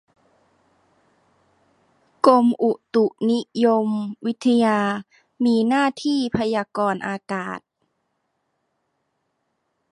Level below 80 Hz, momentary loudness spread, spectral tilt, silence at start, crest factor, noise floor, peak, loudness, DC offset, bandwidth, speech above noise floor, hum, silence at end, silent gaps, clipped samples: -62 dBFS; 11 LU; -6 dB/octave; 2.25 s; 22 dB; -73 dBFS; -2 dBFS; -21 LUFS; under 0.1%; 10.5 kHz; 53 dB; none; 2.35 s; none; under 0.1%